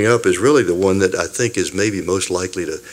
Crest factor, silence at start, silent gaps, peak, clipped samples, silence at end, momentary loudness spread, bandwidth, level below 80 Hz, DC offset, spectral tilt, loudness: 16 dB; 0 s; none; 0 dBFS; under 0.1%; 0 s; 7 LU; 16 kHz; -50 dBFS; under 0.1%; -4.5 dB/octave; -17 LUFS